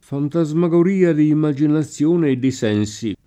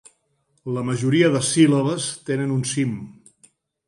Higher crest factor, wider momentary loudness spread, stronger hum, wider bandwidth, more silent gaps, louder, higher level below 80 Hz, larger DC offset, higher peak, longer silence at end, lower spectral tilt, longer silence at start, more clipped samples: about the same, 14 dB vs 18 dB; second, 5 LU vs 14 LU; neither; second, 9.8 kHz vs 11.5 kHz; neither; first, -18 LUFS vs -21 LUFS; about the same, -58 dBFS vs -62 dBFS; neither; about the same, -4 dBFS vs -4 dBFS; second, 0.1 s vs 0.75 s; first, -7.5 dB/octave vs -5 dB/octave; second, 0.1 s vs 0.65 s; neither